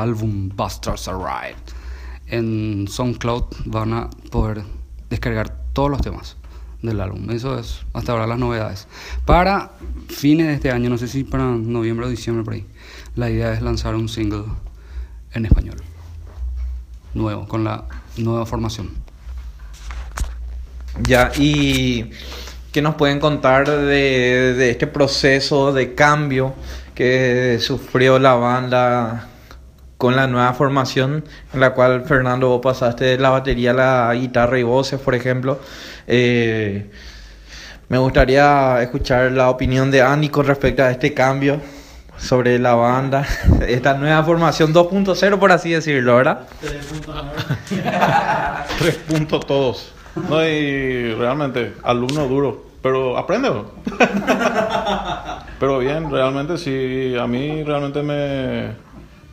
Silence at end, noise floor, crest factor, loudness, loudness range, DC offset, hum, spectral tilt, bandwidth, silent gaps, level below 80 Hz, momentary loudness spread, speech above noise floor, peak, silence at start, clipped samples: 0 s; -41 dBFS; 18 dB; -18 LUFS; 9 LU; under 0.1%; none; -6 dB/octave; 15.5 kHz; none; -32 dBFS; 17 LU; 23 dB; 0 dBFS; 0 s; under 0.1%